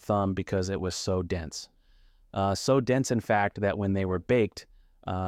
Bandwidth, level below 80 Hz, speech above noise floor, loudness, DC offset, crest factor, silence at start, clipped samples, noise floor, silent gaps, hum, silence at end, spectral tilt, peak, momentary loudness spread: 15 kHz; -52 dBFS; 32 dB; -28 LUFS; under 0.1%; 16 dB; 0.05 s; under 0.1%; -59 dBFS; none; none; 0 s; -5.5 dB/octave; -12 dBFS; 13 LU